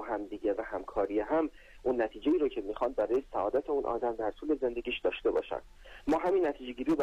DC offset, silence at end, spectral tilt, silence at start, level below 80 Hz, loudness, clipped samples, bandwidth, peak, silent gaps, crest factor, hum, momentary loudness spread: under 0.1%; 0 s; -6.5 dB/octave; 0 s; -54 dBFS; -32 LUFS; under 0.1%; 9.4 kHz; -20 dBFS; none; 12 dB; none; 7 LU